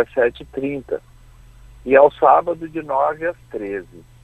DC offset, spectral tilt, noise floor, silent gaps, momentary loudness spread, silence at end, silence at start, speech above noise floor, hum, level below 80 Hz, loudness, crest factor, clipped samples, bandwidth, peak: under 0.1%; -7 dB/octave; -45 dBFS; none; 16 LU; 0.25 s; 0 s; 26 dB; none; -48 dBFS; -18 LUFS; 20 dB; under 0.1%; 8.4 kHz; 0 dBFS